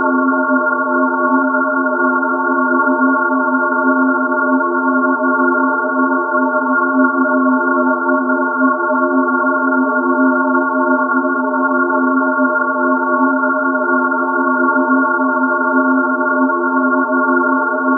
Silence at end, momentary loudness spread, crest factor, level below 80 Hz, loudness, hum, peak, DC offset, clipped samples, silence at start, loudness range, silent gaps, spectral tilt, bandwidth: 0 s; 2 LU; 14 dB; -88 dBFS; -14 LUFS; none; 0 dBFS; under 0.1%; under 0.1%; 0 s; 0 LU; none; 3.5 dB/octave; 1.6 kHz